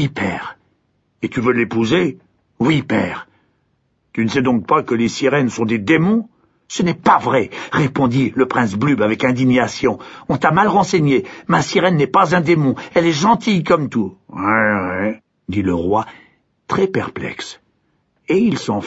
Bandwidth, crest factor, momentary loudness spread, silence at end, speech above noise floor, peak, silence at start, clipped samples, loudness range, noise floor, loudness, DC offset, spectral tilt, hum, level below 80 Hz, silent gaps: 8 kHz; 16 dB; 11 LU; 0 s; 48 dB; -2 dBFS; 0 s; under 0.1%; 4 LU; -64 dBFS; -17 LUFS; under 0.1%; -6 dB/octave; none; -50 dBFS; none